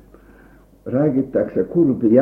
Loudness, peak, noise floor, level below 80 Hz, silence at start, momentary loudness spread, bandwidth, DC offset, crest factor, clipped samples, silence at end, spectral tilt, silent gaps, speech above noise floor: -19 LUFS; -2 dBFS; -48 dBFS; -52 dBFS; 0.85 s; 8 LU; 2.9 kHz; under 0.1%; 16 dB; under 0.1%; 0 s; -12 dB/octave; none; 32 dB